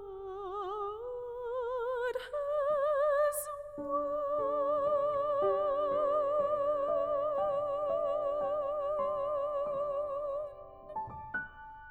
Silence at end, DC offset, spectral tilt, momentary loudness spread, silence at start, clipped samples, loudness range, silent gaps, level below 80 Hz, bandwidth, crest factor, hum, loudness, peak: 0 s; under 0.1%; -4 dB/octave; 11 LU; 0 s; under 0.1%; 4 LU; none; -62 dBFS; 16 kHz; 12 dB; none; -33 LUFS; -20 dBFS